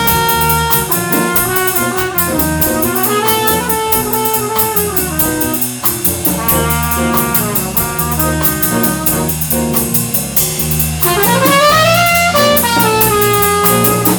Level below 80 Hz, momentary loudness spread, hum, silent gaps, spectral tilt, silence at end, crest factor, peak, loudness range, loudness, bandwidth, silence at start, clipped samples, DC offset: -30 dBFS; 4 LU; none; none; -3.5 dB/octave; 0 s; 12 dB; 0 dBFS; 3 LU; -11 LUFS; over 20 kHz; 0 s; under 0.1%; under 0.1%